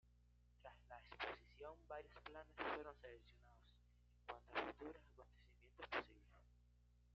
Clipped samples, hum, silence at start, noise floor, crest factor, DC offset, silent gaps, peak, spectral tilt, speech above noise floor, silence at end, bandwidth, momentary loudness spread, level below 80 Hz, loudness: under 0.1%; 60 Hz at -70 dBFS; 0.05 s; -74 dBFS; 26 dB; under 0.1%; none; -30 dBFS; -1.5 dB/octave; 20 dB; 0 s; 7 kHz; 16 LU; -72 dBFS; -53 LUFS